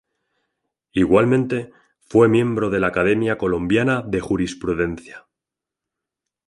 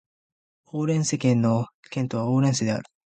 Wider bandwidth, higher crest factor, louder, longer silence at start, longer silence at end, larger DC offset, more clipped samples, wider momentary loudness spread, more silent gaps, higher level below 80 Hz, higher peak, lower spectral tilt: first, 11.5 kHz vs 9.4 kHz; about the same, 18 dB vs 16 dB; first, -19 LUFS vs -24 LUFS; first, 0.95 s vs 0.75 s; first, 1.3 s vs 0.3 s; neither; neither; about the same, 10 LU vs 10 LU; second, none vs 1.74-1.83 s; first, -46 dBFS vs -62 dBFS; first, -2 dBFS vs -8 dBFS; about the same, -7 dB/octave vs -6 dB/octave